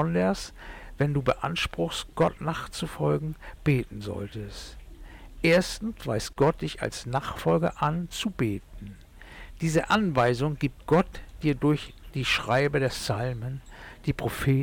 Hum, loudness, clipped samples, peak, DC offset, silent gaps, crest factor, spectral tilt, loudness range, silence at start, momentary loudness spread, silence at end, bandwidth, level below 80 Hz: none; -27 LUFS; under 0.1%; -14 dBFS; under 0.1%; none; 14 dB; -6 dB/octave; 3 LU; 0 s; 15 LU; 0 s; 17.5 kHz; -44 dBFS